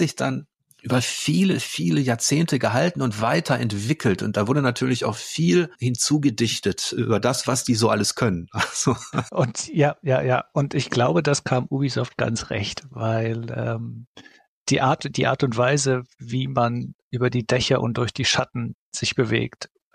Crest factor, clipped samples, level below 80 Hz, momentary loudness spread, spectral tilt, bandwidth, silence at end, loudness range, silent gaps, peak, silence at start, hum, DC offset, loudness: 16 dB; under 0.1%; -54 dBFS; 7 LU; -5 dB/octave; 14.5 kHz; 0.3 s; 3 LU; 14.07-14.14 s, 14.48-14.66 s, 16.94-17.11 s, 18.74-18.92 s; -6 dBFS; 0 s; none; under 0.1%; -22 LUFS